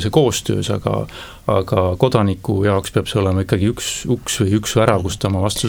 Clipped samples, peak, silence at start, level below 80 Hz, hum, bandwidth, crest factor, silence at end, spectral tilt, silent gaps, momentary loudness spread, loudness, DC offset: under 0.1%; 0 dBFS; 0 s; -40 dBFS; none; 18 kHz; 18 dB; 0 s; -5.5 dB/octave; none; 5 LU; -18 LUFS; under 0.1%